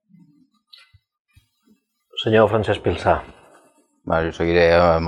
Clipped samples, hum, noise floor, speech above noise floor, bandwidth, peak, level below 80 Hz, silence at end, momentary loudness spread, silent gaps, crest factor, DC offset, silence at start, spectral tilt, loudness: under 0.1%; none; -61 dBFS; 44 dB; 10.5 kHz; -2 dBFS; -42 dBFS; 0 s; 11 LU; none; 20 dB; under 0.1%; 2.15 s; -7 dB/octave; -19 LUFS